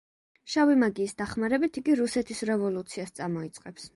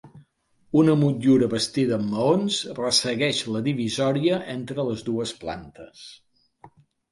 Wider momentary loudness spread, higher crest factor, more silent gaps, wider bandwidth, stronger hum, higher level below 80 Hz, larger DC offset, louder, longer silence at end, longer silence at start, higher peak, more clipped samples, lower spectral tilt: second, 13 LU vs 16 LU; about the same, 16 dB vs 18 dB; neither; about the same, 11.5 kHz vs 11.5 kHz; neither; about the same, -62 dBFS vs -60 dBFS; neither; second, -28 LUFS vs -23 LUFS; second, 0.1 s vs 0.45 s; first, 0.45 s vs 0.05 s; second, -12 dBFS vs -6 dBFS; neither; about the same, -5 dB/octave vs -5 dB/octave